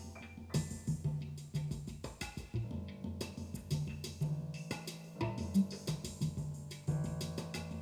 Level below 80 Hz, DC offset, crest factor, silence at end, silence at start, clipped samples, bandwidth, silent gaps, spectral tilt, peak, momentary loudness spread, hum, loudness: -58 dBFS; under 0.1%; 18 dB; 0 s; 0 s; under 0.1%; 18 kHz; none; -6 dB/octave; -22 dBFS; 8 LU; none; -41 LUFS